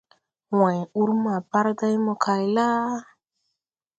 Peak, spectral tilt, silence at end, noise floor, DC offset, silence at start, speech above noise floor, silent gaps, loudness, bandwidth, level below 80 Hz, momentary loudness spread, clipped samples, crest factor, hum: -6 dBFS; -7 dB/octave; 0.95 s; -82 dBFS; under 0.1%; 0.5 s; 59 dB; none; -23 LUFS; 8 kHz; -74 dBFS; 4 LU; under 0.1%; 18 dB; none